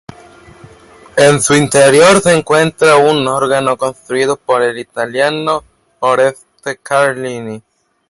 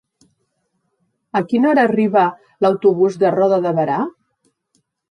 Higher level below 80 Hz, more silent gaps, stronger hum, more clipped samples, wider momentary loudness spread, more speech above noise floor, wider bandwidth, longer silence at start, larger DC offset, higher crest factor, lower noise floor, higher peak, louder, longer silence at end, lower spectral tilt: first, -50 dBFS vs -66 dBFS; neither; neither; neither; first, 14 LU vs 8 LU; second, 29 dB vs 54 dB; first, 11.5 kHz vs 9.6 kHz; second, 1.15 s vs 1.35 s; neither; about the same, 12 dB vs 16 dB; second, -40 dBFS vs -69 dBFS; about the same, 0 dBFS vs -2 dBFS; first, -12 LUFS vs -16 LUFS; second, 0.5 s vs 1 s; second, -4 dB/octave vs -8 dB/octave